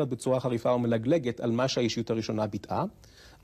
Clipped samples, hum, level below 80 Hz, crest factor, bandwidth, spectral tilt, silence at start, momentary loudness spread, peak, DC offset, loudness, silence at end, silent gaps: under 0.1%; none; -60 dBFS; 14 dB; 14 kHz; -6 dB/octave; 0 s; 6 LU; -14 dBFS; under 0.1%; -29 LUFS; 0.15 s; none